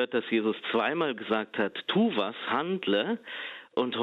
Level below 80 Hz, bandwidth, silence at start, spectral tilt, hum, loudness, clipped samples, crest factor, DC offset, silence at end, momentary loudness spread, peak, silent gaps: -76 dBFS; 5.2 kHz; 0 s; -7.5 dB/octave; none; -29 LUFS; under 0.1%; 16 dB; under 0.1%; 0 s; 6 LU; -14 dBFS; none